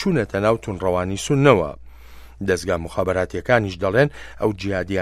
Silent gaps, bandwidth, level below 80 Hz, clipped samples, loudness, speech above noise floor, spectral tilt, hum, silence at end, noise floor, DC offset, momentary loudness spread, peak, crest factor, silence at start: none; 14.5 kHz; -42 dBFS; under 0.1%; -21 LUFS; 21 dB; -6 dB/octave; none; 0 s; -41 dBFS; under 0.1%; 8 LU; 0 dBFS; 20 dB; 0 s